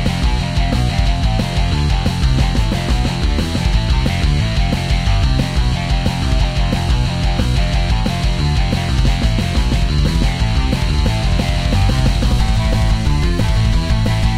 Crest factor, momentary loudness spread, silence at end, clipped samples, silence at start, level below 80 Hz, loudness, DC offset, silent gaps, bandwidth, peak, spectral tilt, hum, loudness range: 14 dB; 2 LU; 0 s; under 0.1%; 0 s; -16 dBFS; -17 LUFS; under 0.1%; none; 13 kHz; 0 dBFS; -5.5 dB/octave; none; 1 LU